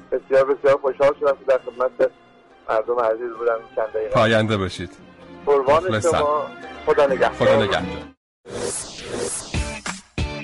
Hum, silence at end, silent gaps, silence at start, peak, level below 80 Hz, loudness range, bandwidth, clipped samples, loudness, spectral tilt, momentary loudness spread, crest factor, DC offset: none; 0 s; 8.17-8.44 s; 0.1 s; -8 dBFS; -42 dBFS; 3 LU; 11.5 kHz; under 0.1%; -21 LUFS; -4.5 dB/octave; 12 LU; 12 dB; under 0.1%